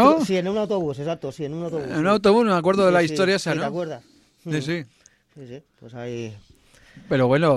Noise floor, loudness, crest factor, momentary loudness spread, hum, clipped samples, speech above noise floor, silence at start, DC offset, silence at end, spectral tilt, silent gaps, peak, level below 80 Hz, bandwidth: -52 dBFS; -22 LUFS; 20 dB; 22 LU; none; under 0.1%; 30 dB; 0 s; under 0.1%; 0 s; -6 dB/octave; none; -2 dBFS; -56 dBFS; 13 kHz